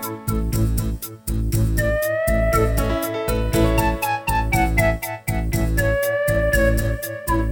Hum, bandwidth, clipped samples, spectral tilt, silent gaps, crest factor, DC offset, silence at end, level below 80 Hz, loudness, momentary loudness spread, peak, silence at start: none; 20 kHz; under 0.1%; -5.5 dB/octave; none; 14 dB; under 0.1%; 0 s; -26 dBFS; -21 LUFS; 7 LU; -4 dBFS; 0 s